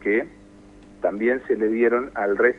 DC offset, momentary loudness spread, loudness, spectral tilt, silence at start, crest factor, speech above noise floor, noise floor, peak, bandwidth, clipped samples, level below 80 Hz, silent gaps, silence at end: under 0.1%; 7 LU; -23 LUFS; -8 dB/octave; 0 s; 18 dB; 26 dB; -47 dBFS; -4 dBFS; 4.2 kHz; under 0.1%; -56 dBFS; none; 0 s